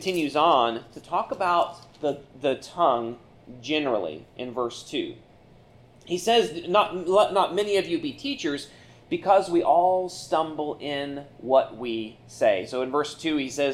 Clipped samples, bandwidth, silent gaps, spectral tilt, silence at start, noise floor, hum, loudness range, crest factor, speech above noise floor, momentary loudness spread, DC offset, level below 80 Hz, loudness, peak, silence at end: under 0.1%; 14 kHz; none; -4.5 dB/octave; 0 s; -53 dBFS; none; 4 LU; 18 dB; 28 dB; 13 LU; under 0.1%; -62 dBFS; -25 LUFS; -6 dBFS; 0 s